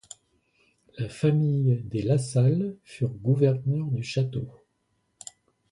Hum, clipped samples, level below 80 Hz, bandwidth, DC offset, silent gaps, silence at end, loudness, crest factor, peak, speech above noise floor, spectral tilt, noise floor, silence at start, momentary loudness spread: none; under 0.1%; -60 dBFS; 11.5 kHz; under 0.1%; none; 1.2 s; -26 LUFS; 18 dB; -10 dBFS; 49 dB; -7.5 dB/octave; -73 dBFS; 0.95 s; 21 LU